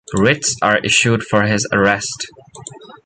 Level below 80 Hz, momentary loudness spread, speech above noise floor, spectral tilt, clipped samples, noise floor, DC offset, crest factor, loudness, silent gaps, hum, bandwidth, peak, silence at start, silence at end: -46 dBFS; 22 LU; 21 dB; -3.5 dB/octave; under 0.1%; -37 dBFS; under 0.1%; 16 dB; -15 LUFS; none; none; 9.6 kHz; 0 dBFS; 0.1 s; 0.1 s